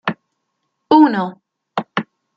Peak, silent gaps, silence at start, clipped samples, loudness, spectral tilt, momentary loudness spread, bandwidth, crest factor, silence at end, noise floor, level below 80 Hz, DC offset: -2 dBFS; none; 0.05 s; under 0.1%; -17 LUFS; -7.5 dB/octave; 15 LU; 5.8 kHz; 16 dB; 0.35 s; -73 dBFS; -68 dBFS; under 0.1%